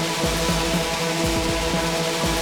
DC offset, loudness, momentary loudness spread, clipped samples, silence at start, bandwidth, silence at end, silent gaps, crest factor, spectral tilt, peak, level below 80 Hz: under 0.1%; -22 LUFS; 1 LU; under 0.1%; 0 s; over 20 kHz; 0 s; none; 14 dB; -3.5 dB/octave; -10 dBFS; -34 dBFS